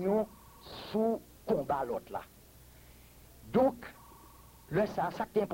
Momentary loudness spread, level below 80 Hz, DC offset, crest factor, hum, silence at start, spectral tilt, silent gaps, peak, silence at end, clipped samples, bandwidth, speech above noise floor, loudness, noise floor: 25 LU; -60 dBFS; under 0.1%; 20 dB; none; 0 s; -7 dB/octave; none; -16 dBFS; 0 s; under 0.1%; 16.5 kHz; 25 dB; -33 LUFS; -56 dBFS